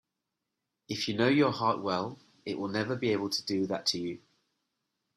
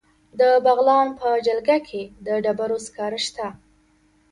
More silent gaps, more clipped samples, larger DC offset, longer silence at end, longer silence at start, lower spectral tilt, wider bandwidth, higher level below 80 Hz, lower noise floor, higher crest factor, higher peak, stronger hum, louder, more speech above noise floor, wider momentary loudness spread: neither; neither; neither; first, 1 s vs 0.8 s; first, 0.9 s vs 0.35 s; first, -5 dB/octave vs -3.5 dB/octave; first, 13.5 kHz vs 11.5 kHz; second, -72 dBFS vs -60 dBFS; first, -86 dBFS vs -60 dBFS; about the same, 20 dB vs 16 dB; second, -12 dBFS vs -6 dBFS; neither; second, -30 LUFS vs -21 LUFS; first, 56 dB vs 39 dB; about the same, 14 LU vs 16 LU